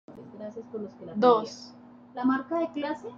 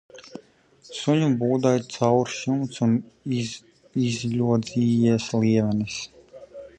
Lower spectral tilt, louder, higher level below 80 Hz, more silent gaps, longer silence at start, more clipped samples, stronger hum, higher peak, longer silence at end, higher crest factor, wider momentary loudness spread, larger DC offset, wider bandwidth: about the same, -6 dB/octave vs -6.5 dB/octave; second, -27 LUFS vs -24 LUFS; second, -74 dBFS vs -58 dBFS; neither; about the same, 0.1 s vs 0.15 s; neither; neither; about the same, -8 dBFS vs -6 dBFS; about the same, 0 s vs 0.1 s; about the same, 22 dB vs 18 dB; first, 21 LU vs 18 LU; neither; second, 7.4 kHz vs 9.4 kHz